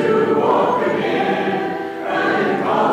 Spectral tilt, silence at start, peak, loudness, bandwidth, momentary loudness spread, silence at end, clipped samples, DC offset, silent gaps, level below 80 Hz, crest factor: -6.5 dB/octave; 0 s; -4 dBFS; -18 LUFS; 14.5 kHz; 6 LU; 0 s; under 0.1%; under 0.1%; none; -64 dBFS; 14 dB